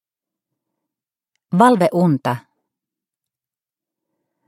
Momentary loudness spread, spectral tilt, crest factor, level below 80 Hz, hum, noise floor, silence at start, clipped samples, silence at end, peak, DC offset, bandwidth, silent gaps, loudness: 11 LU; -7.5 dB/octave; 22 dB; -70 dBFS; none; -90 dBFS; 1.5 s; under 0.1%; 2.1 s; 0 dBFS; under 0.1%; 13.5 kHz; none; -16 LUFS